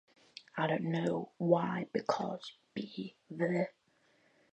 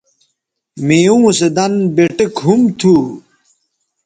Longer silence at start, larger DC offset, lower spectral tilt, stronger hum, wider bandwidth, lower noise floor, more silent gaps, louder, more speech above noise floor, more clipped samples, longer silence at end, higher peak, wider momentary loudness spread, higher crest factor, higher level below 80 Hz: second, 0.35 s vs 0.75 s; neither; first, -7 dB/octave vs -5.5 dB/octave; neither; second, 8.4 kHz vs 9.4 kHz; about the same, -71 dBFS vs -71 dBFS; neither; second, -36 LUFS vs -12 LUFS; second, 36 dB vs 60 dB; neither; about the same, 0.85 s vs 0.85 s; second, -14 dBFS vs 0 dBFS; first, 14 LU vs 8 LU; first, 22 dB vs 14 dB; second, -80 dBFS vs -54 dBFS